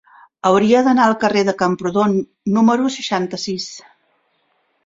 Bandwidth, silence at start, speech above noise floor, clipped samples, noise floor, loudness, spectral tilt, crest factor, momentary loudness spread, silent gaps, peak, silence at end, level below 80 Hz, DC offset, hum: 7.8 kHz; 0.45 s; 48 dB; under 0.1%; -64 dBFS; -17 LUFS; -5.5 dB/octave; 16 dB; 11 LU; none; -2 dBFS; 1.05 s; -58 dBFS; under 0.1%; none